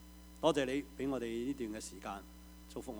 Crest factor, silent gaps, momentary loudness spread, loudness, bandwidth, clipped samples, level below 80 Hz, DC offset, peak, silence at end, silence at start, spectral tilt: 22 dB; none; 19 LU; -38 LUFS; over 20 kHz; under 0.1%; -58 dBFS; under 0.1%; -16 dBFS; 0 s; 0 s; -5 dB/octave